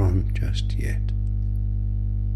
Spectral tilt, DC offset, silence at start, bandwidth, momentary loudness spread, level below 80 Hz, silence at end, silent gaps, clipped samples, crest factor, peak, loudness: -7 dB/octave; under 0.1%; 0 s; 11.5 kHz; 3 LU; -26 dBFS; 0 s; none; under 0.1%; 14 dB; -10 dBFS; -26 LUFS